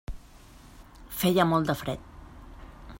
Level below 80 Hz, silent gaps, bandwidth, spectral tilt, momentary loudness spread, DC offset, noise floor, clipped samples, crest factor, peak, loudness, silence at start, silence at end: -48 dBFS; none; 16.5 kHz; -5.5 dB/octave; 26 LU; under 0.1%; -51 dBFS; under 0.1%; 22 dB; -8 dBFS; -27 LUFS; 0.1 s; 0 s